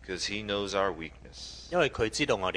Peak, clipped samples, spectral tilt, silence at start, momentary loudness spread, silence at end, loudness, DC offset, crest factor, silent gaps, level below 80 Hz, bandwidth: -10 dBFS; under 0.1%; -3.5 dB/octave; 0 s; 15 LU; 0 s; -30 LUFS; under 0.1%; 20 dB; none; -50 dBFS; 11 kHz